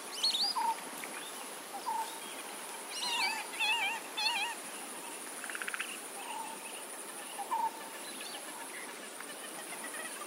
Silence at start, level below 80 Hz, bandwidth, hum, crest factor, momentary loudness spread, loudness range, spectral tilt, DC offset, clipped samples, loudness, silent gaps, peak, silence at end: 0 s; under -90 dBFS; 16 kHz; none; 20 dB; 11 LU; 6 LU; 1 dB/octave; under 0.1%; under 0.1%; -36 LUFS; none; -18 dBFS; 0 s